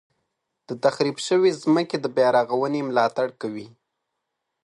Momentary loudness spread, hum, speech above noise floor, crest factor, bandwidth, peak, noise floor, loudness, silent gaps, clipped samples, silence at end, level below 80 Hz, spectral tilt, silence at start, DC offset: 13 LU; none; 58 dB; 18 dB; 11.5 kHz; -6 dBFS; -80 dBFS; -22 LUFS; none; under 0.1%; 0.95 s; -74 dBFS; -5 dB/octave; 0.7 s; under 0.1%